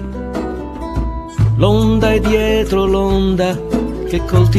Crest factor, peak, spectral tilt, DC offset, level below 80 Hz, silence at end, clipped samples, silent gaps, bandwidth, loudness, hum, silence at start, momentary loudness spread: 14 dB; 0 dBFS; -7 dB/octave; under 0.1%; -24 dBFS; 0 s; under 0.1%; none; 13.5 kHz; -16 LUFS; none; 0 s; 10 LU